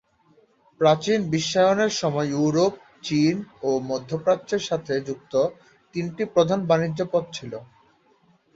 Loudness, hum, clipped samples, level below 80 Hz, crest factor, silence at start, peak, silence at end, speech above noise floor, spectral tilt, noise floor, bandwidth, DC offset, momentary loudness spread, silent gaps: -23 LUFS; none; under 0.1%; -62 dBFS; 18 dB; 0.8 s; -6 dBFS; 0.9 s; 38 dB; -5.5 dB/octave; -61 dBFS; 7.8 kHz; under 0.1%; 11 LU; none